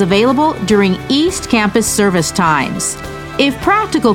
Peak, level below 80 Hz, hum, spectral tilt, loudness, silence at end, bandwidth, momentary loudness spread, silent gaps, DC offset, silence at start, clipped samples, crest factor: 0 dBFS; -36 dBFS; none; -4 dB/octave; -13 LUFS; 0 s; 17 kHz; 6 LU; none; under 0.1%; 0 s; under 0.1%; 12 dB